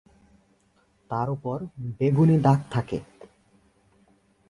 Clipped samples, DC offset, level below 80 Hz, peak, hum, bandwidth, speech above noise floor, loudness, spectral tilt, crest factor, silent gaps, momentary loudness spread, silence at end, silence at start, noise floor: under 0.1%; under 0.1%; -56 dBFS; -6 dBFS; none; 11 kHz; 41 dB; -25 LUFS; -9 dB/octave; 20 dB; none; 15 LU; 1.45 s; 1.1 s; -65 dBFS